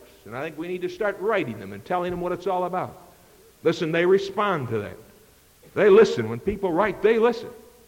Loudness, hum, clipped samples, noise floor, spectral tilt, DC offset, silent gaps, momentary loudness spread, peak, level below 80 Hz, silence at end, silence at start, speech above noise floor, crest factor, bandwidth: -23 LUFS; none; under 0.1%; -54 dBFS; -6.5 dB/octave; under 0.1%; none; 16 LU; -8 dBFS; -54 dBFS; 0.3 s; 0.25 s; 32 dB; 16 dB; 16.5 kHz